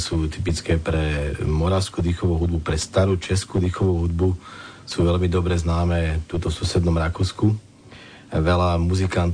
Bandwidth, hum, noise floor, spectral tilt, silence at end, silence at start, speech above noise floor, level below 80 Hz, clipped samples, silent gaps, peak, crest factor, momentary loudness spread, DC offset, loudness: 10 kHz; none; -44 dBFS; -6.5 dB/octave; 0 s; 0 s; 23 dB; -32 dBFS; under 0.1%; none; -8 dBFS; 14 dB; 5 LU; under 0.1%; -22 LUFS